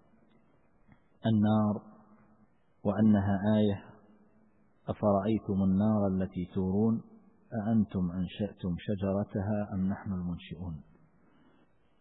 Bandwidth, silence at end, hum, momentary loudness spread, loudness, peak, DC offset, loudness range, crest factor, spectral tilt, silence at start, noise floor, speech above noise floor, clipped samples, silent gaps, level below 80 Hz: 4 kHz; 1.2 s; none; 13 LU; -31 LUFS; -14 dBFS; under 0.1%; 5 LU; 18 dB; -12 dB/octave; 1.25 s; -68 dBFS; 38 dB; under 0.1%; none; -60 dBFS